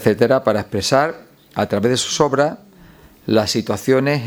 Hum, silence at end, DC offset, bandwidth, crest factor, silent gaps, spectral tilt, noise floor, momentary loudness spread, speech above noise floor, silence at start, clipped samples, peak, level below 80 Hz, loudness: none; 0 s; under 0.1%; 19.5 kHz; 18 dB; none; -4.5 dB/octave; -45 dBFS; 11 LU; 28 dB; 0 s; under 0.1%; 0 dBFS; -52 dBFS; -18 LUFS